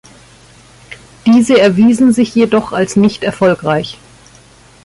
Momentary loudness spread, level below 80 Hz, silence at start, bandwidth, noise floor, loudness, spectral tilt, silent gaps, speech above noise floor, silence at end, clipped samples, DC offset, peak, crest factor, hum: 8 LU; -48 dBFS; 0.9 s; 11.5 kHz; -42 dBFS; -11 LUFS; -6 dB/octave; none; 32 dB; 0.9 s; under 0.1%; under 0.1%; -2 dBFS; 12 dB; none